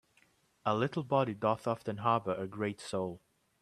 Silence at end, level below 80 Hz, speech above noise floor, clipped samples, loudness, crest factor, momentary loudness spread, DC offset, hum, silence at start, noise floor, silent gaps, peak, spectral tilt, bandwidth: 0.45 s; -72 dBFS; 36 dB; under 0.1%; -34 LUFS; 20 dB; 7 LU; under 0.1%; none; 0.65 s; -70 dBFS; none; -14 dBFS; -6.5 dB/octave; 13 kHz